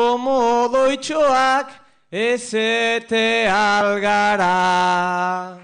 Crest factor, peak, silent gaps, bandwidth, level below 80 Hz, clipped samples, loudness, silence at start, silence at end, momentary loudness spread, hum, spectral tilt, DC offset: 12 dB; -6 dBFS; none; 10 kHz; -56 dBFS; under 0.1%; -17 LUFS; 0 s; 0.05 s; 6 LU; none; -3.5 dB/octave; under 0.1%